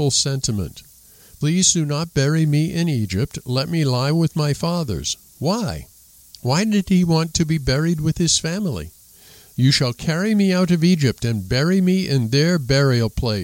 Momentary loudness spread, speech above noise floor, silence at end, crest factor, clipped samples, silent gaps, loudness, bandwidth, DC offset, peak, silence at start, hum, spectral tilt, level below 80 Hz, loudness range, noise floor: 8 LU; 29 dB; 0 s; 16 dB; under 0.1%; none; -19 LUFS; 17 kHz; under 0.1%; -2 dBFS; 0 s; none; -5 dB/octave; -40 dBFS; 3 LU; -47 dBFS